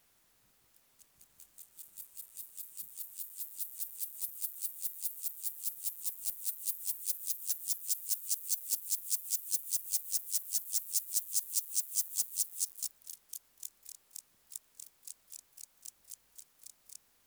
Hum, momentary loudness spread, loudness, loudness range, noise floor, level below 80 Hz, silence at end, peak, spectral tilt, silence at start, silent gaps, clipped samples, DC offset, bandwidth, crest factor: none; 19 LU; -34 LUFS; 16 LU; -70 dBFS; -88 dBFS; 0.3 s; -14 dBFS; 4.5 dB/octave; 1 s; none; under 0.1%; under 0.1%; over 20 kHz; 26 dB